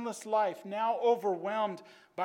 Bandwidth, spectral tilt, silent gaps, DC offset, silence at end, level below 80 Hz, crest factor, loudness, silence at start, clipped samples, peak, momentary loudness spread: 16 kHz; -4.5 dB/octave; none; under 0.1%; 0 s; under -90 dBFS; 16 dB; -32 LUFS; 0 s; under 0.1%; -16 dBFS; 9 LU